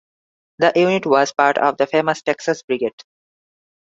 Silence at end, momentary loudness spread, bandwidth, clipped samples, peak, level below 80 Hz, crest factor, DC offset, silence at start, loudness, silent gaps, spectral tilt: 1 s; 7 LU; 7.8 kHz; under 0.1%; 0 dBFS; -66 dBFS; 18 dB; under 0.1%; 0.6 s; -18 LUFS; 2.64-2.68 s; -4.5 dB/octave